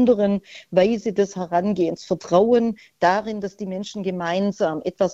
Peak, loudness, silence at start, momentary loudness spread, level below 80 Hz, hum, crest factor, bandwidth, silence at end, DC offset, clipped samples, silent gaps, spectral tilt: -4 dBFS; -22 LUFS; 0 s; 10 LU; -58 dBFS; none; 16 dB; 8 kHz; 0 s; under 0.1%; under 0.1%; none; -6.5 dB/octave